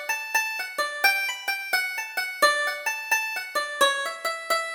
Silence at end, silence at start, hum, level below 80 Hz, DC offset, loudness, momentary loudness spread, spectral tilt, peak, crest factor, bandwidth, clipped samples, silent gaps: 0 s; 0 s; none; -70 dBFS; under 0.1%; -24 LUFS; 7 LU; 2 dB/octave; -6 dBFS; 20 dB; over 20 kHz; under 0.1%; none